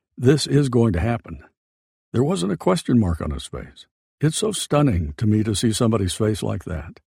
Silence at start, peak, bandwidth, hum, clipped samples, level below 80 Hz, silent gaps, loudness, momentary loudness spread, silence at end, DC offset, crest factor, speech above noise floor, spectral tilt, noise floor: 0.2 s; -4 dBFS; 16 kHz; none; under 0.1%; -38 dBFS; 1.57-2.12 s, 3.91-4.18 s; -21 LUFS; 13 LU; 0.2 s; under 0.1%; 18 dB; over 70 dB; -6 dB/octave; under -90 dBFS